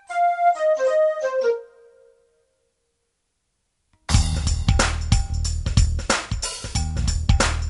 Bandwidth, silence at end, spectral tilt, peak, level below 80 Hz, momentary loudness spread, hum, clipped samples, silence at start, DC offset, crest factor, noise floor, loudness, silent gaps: 11.5 kHz; 0 s; -4.5 dB/octave; -2 dBFS; -26 dBFS; 7 LU; none; under 0.1%; 0.1 s; under 0.1%; 20 dB; -74 dBFS; -22 LUFS; none